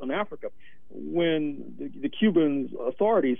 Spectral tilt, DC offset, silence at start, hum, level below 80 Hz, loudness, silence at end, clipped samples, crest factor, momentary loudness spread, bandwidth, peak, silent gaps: -9.5 dB/octave; 1%; 0 s; none; -64 dBFS; -26 LUFS; 0 s; under 0.1%; 16 dB; 17 LU; 3.7 kHz; -10 dBFS; none